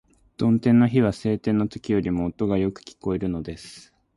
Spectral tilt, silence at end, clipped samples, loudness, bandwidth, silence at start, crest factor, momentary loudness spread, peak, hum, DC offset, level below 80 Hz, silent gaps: -8 dB/octave; 0.35 s; under 0.1%; -23 LUFS; 11.5 kHz; 0.4 s; 16 dB; 15 LU; -8 dBFS; none; under 0.1%; -48 dBFS; none